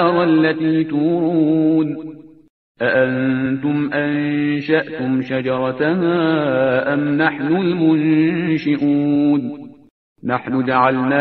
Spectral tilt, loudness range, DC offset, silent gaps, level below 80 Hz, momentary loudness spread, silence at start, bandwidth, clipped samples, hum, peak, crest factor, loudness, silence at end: -9.5 dB/octave; 2 LU; under 0.1%; 2.50-2.75 s, 9.90-10.16 s; -58 dBFS; 6 LU; 0 s; 5.6 kHz; under 0.1%; none; -2 dBFS; 16 dB; -17 LUFS; 0 s